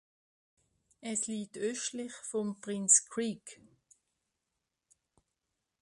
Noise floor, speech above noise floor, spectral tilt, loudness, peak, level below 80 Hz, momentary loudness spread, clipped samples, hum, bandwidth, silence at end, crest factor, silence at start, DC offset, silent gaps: -86 dBFS; 52 dB; -2.5 dB/octave; -31 LUFS; -10 dBFS; -80 dBFS; 18 LU; under 0.1%; none; 11.5 kHz; 2.3 s; 26 dB; 1 s; under 0.1%; none